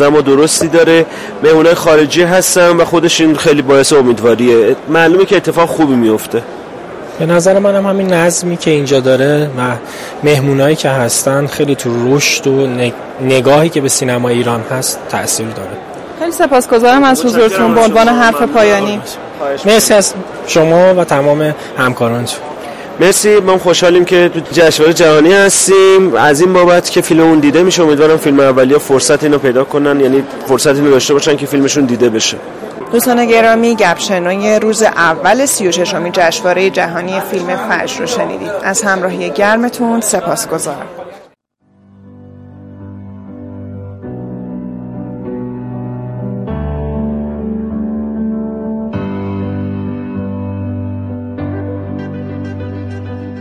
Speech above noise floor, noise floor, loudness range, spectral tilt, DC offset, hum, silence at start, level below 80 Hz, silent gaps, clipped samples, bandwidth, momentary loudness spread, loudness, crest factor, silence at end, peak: 43 dB; -53 dBFS; 14 LU; -4 dB/octave; under 0.1%; none; 0 s; -40 dBFS; none; under 0.1%; 16 kHz; 16 LU; -10 LUFS; 10 dB; 0 s; 0 dBFS